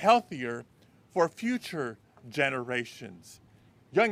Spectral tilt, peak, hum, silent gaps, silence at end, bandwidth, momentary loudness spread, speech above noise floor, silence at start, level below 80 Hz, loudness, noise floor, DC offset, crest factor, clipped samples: -5 dB/octave; -8 dBFS; none; none; 0 s; 15.5 kHz; 19 LU; 30 dB; 0 s; -74 dBFS; -31 LUFS; -59 dBFS; under 0.1%; 22 dB; under 0.1%